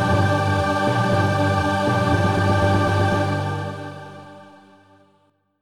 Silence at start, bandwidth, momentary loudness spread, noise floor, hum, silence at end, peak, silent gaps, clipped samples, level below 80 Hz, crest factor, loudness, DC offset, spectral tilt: 0 s; 12.5 kHz; 15 LU; -63 dBFS; none; 1.15 s; -6 dBFS; none; under 0.1%; -42 dBFS; 14 dB; -20 LUFS; 0.1%; -6.5 dB/octave